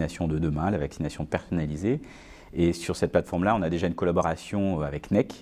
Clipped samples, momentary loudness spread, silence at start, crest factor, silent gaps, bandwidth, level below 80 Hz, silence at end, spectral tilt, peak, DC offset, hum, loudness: under 0.1%; 7 LU; 0 s; 20 dB; none; 14.5 kHz; -42 dBFS; 0 s; -7 dB/octave; -8 dBFS; under 0.1%; none; -27 LUFS